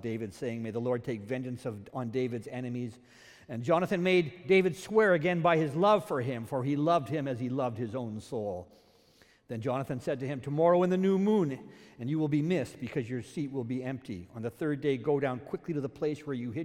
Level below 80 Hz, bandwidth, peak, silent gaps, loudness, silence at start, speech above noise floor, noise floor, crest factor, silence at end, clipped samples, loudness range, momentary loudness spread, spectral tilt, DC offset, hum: -70 dBFS; 15.5 kHz; -12 dBFS; none; -31 LUFS; 0 s; 32 dB; -63 dBFS; 18 dB; 0 s; under 0.1%; 8 LU; 12 LU; -7 dB/octave; under 0.1%; none